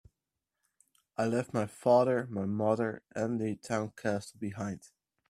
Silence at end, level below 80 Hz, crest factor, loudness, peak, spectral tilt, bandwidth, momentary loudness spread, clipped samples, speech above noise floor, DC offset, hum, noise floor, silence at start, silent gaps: 0.45 s; -72 dBFS; 20 dB; -32 LUFS; -12 dBFS; -6.5 dB/octave; 13.5 kHz; 13 LU; under 0.1%; 56 dB; under 0.1%; none; -88 dBFS; 1.2 s; none